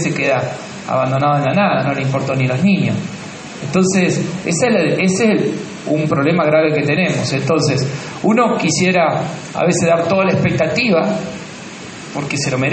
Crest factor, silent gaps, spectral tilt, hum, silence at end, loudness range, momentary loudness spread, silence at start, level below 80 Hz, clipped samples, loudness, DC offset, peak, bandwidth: 14 dB; none; -5.5 dB/octave; none; 0 s; 2 LU; 11 LU; 0 s; -52 dBFS; under 0.1%; -15 LUFS; under 0.1%; -2 dBFS; 8.8 kHz